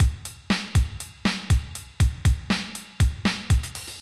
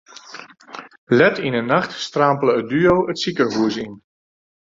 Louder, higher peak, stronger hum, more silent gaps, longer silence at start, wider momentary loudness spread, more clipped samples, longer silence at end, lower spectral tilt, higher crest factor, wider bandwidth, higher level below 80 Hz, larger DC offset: second, -25 LUFS vs -18 LUFS; second, -10 dBFS vs -2 dBFS; neither; second, none vs 0.98-1.07 s; second, 0 s vs 0.3 s; second, 9 LU vs 22 LU; neither; second, 0 s vs 0.8 s; about the same, -5 dB/octave vs -5.5 dB/octave; about the same, 14 dB vs 18 dB; first, 13.5 kHz vs 7.8 kHz; first, -28 dBFS vs -54 dBFS; neither